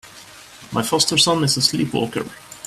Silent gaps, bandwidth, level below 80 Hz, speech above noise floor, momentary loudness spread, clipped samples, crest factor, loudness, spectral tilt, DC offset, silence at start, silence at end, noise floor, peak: none; 16 kHz; -54 dBFS; 23 dB; 12 LU; under 0.1%; 20 dB; -18 LUFS; -3 dB/octave; under 0.1%; 0.05 s; 0 s; -42 dBFS; -2 dBFS